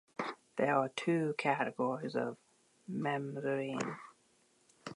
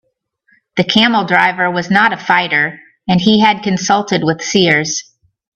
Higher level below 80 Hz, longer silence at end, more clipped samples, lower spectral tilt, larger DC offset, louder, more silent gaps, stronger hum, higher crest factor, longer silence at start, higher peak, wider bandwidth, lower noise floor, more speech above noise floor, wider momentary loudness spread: second, -84 dBFS vs -54 dBFS; second, 0 s vs 0.55 s; neither; first, -6 dB/octave vs -4 dB/octave; neither; second, -36 LUFS vs -13 LUFS; neither; neither; first, 20 dB vs 14 dB; second, 0.2 s vs 0.75 s; second, -16 dBFS vs 0 dBFS; first, 11.5 kHz vs 8.4 kHz; first, -71 dBFS vs -61 dBFS; second, 36 dB vs 48 dB; first, 12 LU vs 8 LU